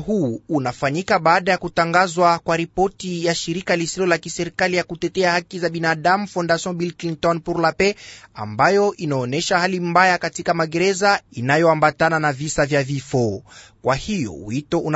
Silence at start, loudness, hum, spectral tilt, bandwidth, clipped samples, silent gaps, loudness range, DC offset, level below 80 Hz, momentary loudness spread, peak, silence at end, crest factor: 0 s; -19 LUFS; none; -4.5 dB/octave; 8 kHz; under 0.1%; none; 3 LU; under 0.1%; -50 dBFS; 9 LU; -2 dBFS; 0 s; 18 dB